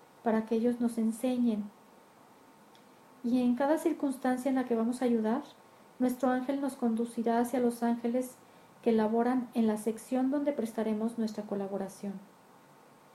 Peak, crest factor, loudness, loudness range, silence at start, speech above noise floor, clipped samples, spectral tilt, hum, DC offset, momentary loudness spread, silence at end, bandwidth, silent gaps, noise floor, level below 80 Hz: -16 dBFS; 16 dB; -31 LUFS; 3 LU; 0.25 s; 28 dB; under 0.1%; -6 dB/octave; none; under 0.1%; 8 LU; 0.9 s; 14.5 kHz; none; -58 dBFS; -76 dBFS